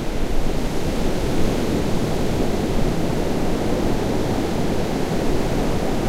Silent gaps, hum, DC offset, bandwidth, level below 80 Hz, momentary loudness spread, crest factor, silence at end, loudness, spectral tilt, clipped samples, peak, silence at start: none; none; under 0.1%; 15.5 kHz; -26 dBFS; 3 LU; 12 dB; 0 s; -23 LUFS; -6 dB/octave; under 0.1%; -6 dBFS; 0 s